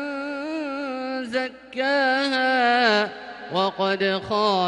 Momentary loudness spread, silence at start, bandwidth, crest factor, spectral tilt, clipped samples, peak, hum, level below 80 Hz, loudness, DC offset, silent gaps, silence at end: 10 LU; 0 s; 11 kHz; 16 dB; -4.5 dB/octave; under 0.1%; -6 dBFS; none; -64 dBFS; -23 LUFS; under 0.1%; none; 0 s